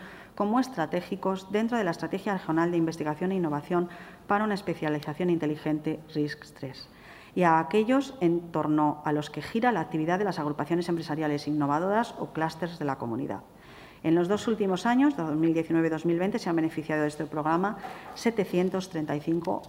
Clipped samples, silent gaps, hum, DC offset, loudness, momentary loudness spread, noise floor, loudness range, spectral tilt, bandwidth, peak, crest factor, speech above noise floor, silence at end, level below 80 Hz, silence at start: under 0.1%; none; none; under 0.1%; -28 LUFS; 8 LU; -49 dBFS; 3 LU; -7 dB/octave; 16 kHz; -10 dBFS; 18 dB; 22 dB; 0 s; -64 dBFS; 0 s